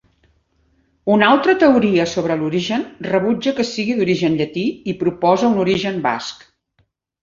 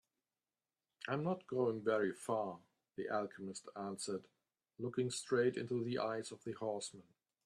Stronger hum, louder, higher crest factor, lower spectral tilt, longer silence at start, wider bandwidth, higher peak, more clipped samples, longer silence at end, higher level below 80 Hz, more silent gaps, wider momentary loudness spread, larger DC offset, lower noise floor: neither; first, -17 LUFS vs -40 LUFS; about the same, 16 dB vs 18 dB; about the same, -5.5 dB/octave vs -5 dB/octave; about the same, 1.05 s vs 1.05 s; second, 7.6 kHz vs 13 kHz; first, -2 dBFS vs -22 dBFS; neither; first, 0.85 s vs 0.45 s; first, -54 dBFS vs -82 dBFS; neither; second, 9 LU vs 12 LU; neither; second, -64 dBFS vs under -90 dBFS